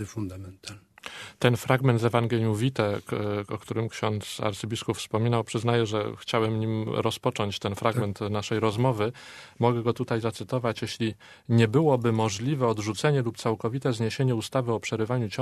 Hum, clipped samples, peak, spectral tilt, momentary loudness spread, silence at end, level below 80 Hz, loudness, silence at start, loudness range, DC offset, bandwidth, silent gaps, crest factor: none; under 0.1%; -4 dBFS; -6 dB/octave; 9 LU; 0 s; -62 dBFS; -27 LUFS; 0 s; 3 LU; under 0.1%; 13.5 kHz; none; 22 dB